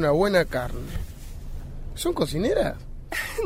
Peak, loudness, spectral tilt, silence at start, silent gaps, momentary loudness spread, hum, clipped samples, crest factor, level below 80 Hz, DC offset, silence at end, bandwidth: -8 dBFS; -26 LUFS; -5.5 dB/octave; 0 s; none; 19 LU; none; under 0.1%; 18 dB; -36 dBFS; under 0.1%; 0 s; 16 kHz